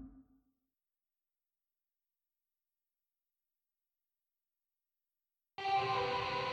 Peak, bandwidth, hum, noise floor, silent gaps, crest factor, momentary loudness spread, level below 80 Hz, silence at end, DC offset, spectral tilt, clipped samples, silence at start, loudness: -26 dBFS; 10.5 kHz; none; under -90 dBFS; none; 18 dB; 10 LU; -72 dBFS; 0 s; under 0.1%; -4.5 dB/octave; under 0.1%; 0 s; -36 LUFS